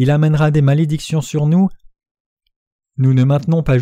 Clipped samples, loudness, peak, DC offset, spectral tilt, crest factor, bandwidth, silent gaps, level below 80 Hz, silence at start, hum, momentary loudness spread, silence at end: under 0.1%; -15 LUFS; -4 dBFS; under 0.1%; -8 dB/octave; 12 dB; 10.5 kHz; 2.11-2.37 s, 2.56-2.79 s; -38 dBFS; 0 s; none; 7 LU; 0 s